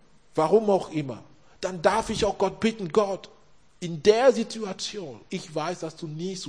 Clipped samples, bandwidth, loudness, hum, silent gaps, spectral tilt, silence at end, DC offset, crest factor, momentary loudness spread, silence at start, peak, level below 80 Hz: under 0.1%; 10.5 kHz; -26 LUFS; none; none; -5 dB/octave; 0 s; 0.2%; 22 dB; 15 LU; 0.35 s; -4 dBFS; -54 dBFS